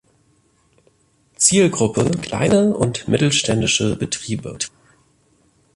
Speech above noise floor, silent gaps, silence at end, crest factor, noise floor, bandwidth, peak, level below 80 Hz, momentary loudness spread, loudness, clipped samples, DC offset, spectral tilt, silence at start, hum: 42 dB; none; 1.05 s; 18 dB; -60 dBFS; 11.5 kHz; -2 dBFS; -48 dBFS; 12 LU; -18 LUFS; under 0.1%; under 0.1%; -4 dB/octave; 1.4 s; none